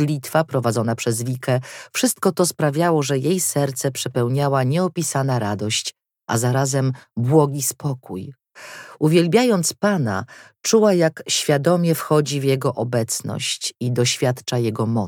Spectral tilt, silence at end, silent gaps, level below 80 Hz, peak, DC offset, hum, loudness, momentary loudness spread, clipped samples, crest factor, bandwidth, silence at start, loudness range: -5 dB/octave; 0 s; none; -66 dBFS; -2 dBFS; under 0.1%; none; -20 LUFS; 9 LU; under 0.1%; 18 dB; 18 kHz; 0 s; 3 LU